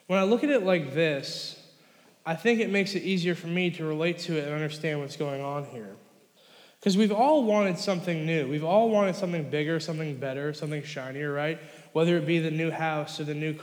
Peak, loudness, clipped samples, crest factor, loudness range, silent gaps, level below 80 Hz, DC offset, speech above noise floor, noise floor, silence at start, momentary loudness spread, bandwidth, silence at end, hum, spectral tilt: -10 dBFS; -27 LUFS; under 0.1%; 16 dB; 5 LU; none; -90 dBFS; under 0.1%; 32 dB; -59 dBFS; 0.1 s; 11 LU; 19 kHz; 0 s; none; -6 dB/octave